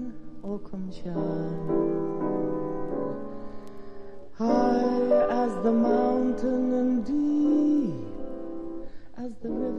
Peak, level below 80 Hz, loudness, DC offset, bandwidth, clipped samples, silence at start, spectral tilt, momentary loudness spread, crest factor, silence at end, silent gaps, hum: -12 dBFS; -52 dBFS; -27 LUFS; 1%; 8 kHz; under 0.1%; 0 s; -8.5 dB/octave; 19 LU; 16 dB; 0 s; none; none